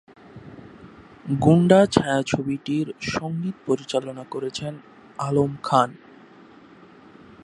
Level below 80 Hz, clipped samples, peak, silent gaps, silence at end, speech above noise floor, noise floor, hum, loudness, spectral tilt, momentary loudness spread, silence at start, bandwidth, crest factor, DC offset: -54 dBFS; under 0.1%; 0 dBFS; none; 1.5 s; 27 dB; -48 dBFS; none; -22 LUFS; -6.5 dB/octave; 25 LU; 0.35 s; 11.5 kHz; 22 dB; under 0.1%